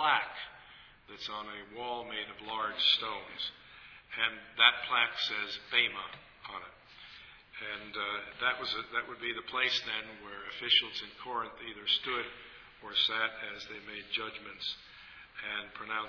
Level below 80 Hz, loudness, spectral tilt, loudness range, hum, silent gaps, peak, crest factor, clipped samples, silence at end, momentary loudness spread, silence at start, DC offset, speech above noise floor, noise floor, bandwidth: -68 dBFS; -32 LUFS; -2 dB/octave; 6 LU; none; none; -8 dBFS; 28 dB; under 0.1%; 0 s; 22 LU; 0 s; under 0.1%; 21 dB; -56 dBFS; 5.4 kHz